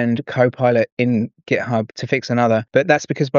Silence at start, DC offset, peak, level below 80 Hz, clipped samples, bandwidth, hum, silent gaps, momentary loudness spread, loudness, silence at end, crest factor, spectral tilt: 0 s; under 0.1%; -2 dBFS; -64 dBFS; under 0.1%; 7.4 kHz; none; 0.92-0.97 s; 6 LU; -18 LUFS; 0 s; 16 dB; -5.5 dB/octave